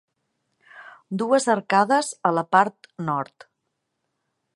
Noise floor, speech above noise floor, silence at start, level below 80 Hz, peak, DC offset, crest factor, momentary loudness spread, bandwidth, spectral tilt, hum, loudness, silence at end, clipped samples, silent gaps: -78 dBFS; 56 dB; 0.75 s; -74 dBFS; -4 dBFS; under 0.1%; 20 dB; 12 LU; 11.5 kHz; -4.5 dB/octave; none; -22 LUFS; 1.3 s; under 0.1%; none